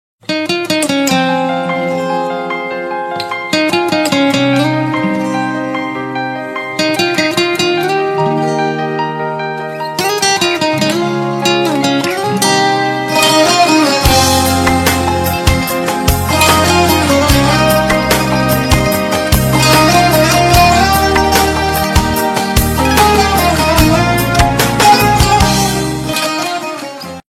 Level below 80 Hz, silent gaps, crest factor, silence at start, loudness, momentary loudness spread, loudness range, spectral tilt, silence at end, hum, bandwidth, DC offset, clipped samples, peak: -26 dBFS; none; 12 dB; 0.3 s; -12 LUFS; 10 LU; 5 LU; -4 dB/octave; 0.1 s; none; over 20 kHz; under 0.1%; under 0.1%; 0 dBFS